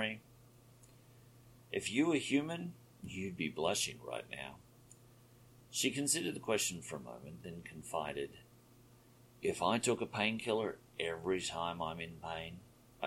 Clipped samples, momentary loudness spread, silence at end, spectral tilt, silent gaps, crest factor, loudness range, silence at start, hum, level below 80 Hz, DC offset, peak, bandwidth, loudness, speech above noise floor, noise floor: under 0.1%; 15 LU; 0 s; -3.5 dB/octave; none; 24 dB; 4 LU; 0 s; none; -70 dBFS; under 0.1%; -16 dBFS; 16.5 kHz; -38 LUFS; 25 dB; -63 dBFS